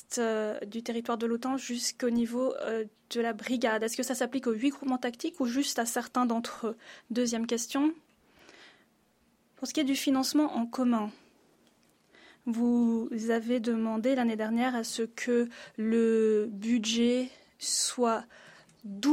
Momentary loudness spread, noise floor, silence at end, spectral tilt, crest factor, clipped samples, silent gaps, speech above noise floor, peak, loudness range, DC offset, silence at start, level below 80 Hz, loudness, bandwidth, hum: 9 LU; -68 dBFS; 0 s; -3.5 dB/octave; 14 dB; under 0.1%; none; 39 dB; -16 dBFS; 3 LU; under 0.1%; 0.1 s; -74 dBFS; -30 LUFS; 16 kHz; none